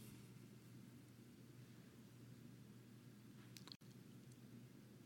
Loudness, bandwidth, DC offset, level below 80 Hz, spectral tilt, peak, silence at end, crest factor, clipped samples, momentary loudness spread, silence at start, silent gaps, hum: -62 LUFS; 17 kHz; under 0.1%; -86 dBFS; -5 dB/octave; -34 dBFS; 0 s; 28 dB; under 0.1%; 4 LU; 0 s; 3.76-3.80 s; none